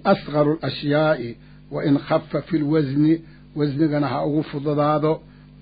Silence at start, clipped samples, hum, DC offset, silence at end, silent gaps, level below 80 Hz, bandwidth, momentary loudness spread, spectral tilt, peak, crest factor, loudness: 0.05 s; under 0.1%; none; under 0.1%; 0.4 s; none; -52 dBFS; 5 kHz; 6 LU; -11 dB/octave; -4 dBFS; 18 dB; -21 LUFS